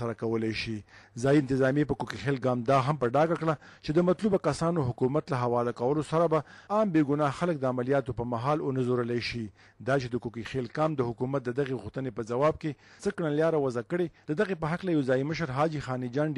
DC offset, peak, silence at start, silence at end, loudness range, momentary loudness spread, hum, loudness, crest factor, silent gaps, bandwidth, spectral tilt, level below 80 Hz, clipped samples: under 0.1%; -16 dBFS; 0 s; 0 s; 4 LU; 9 LU; none; -29 LUFS; 14 dB; none; 11 kHz; -7 dB/octave; -56 dBFS; under 0.1%